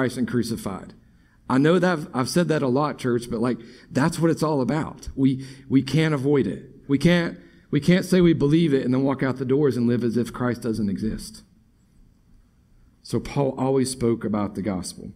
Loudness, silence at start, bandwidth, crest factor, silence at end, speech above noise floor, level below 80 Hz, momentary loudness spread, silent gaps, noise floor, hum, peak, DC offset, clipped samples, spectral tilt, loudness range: -23 LUFS; 0 s; 14.5 kHz; 18 dB; 0.05 s; 35 dB; -48 dBFS; 11 LU; none; -58 dBFS; none; -6 dBFS; under 0.1%; under 0.1%; -6.5 dB/octave; 7 LU